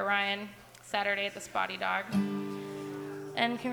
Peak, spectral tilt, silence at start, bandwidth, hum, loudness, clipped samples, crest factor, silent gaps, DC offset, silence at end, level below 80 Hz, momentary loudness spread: -14 dBFS; -4.5 dB/octave; 0 s; over 20 kHz; none; -33 LUFS; under 0.1%; 20 dB; none; under 0.1%; 0 s; -72 dBFS; 10 LU